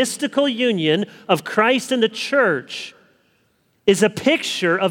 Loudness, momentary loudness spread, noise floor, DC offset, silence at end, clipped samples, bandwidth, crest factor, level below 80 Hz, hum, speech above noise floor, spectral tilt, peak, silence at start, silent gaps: -19 LUFS; 6 LU; -63 dBFS; under 0.1%; 0 s; under 0.1%; 19 kHz; 18 dB; -64 dBFS; none; 44 dB; -4 dB/octave; 0 dBFS; 0 s; none